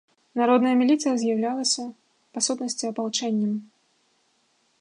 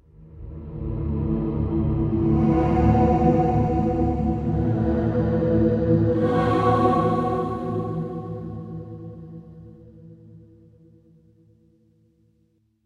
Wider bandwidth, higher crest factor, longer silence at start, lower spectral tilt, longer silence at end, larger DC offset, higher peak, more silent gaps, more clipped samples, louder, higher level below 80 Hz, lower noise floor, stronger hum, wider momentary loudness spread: first, 11 kHz vs 7.2 kHz; about the same, 18 dB vs 18 dB; first, 0.35 s vs 0.2 s; second, -3.5 dB/octave vs -10 dB/octave; second, 1.15 s vs 2.45 s; neither; about the same, -8 dBFS vs -6 dBFS; neither; neither; about the same, -24 LUFS vs -22 LUFS; second, -80 dBFS vs -34 dBFS; about the same, -67 dBFS vs -65 dBFS; neither; second, 12 LU vs 18 LU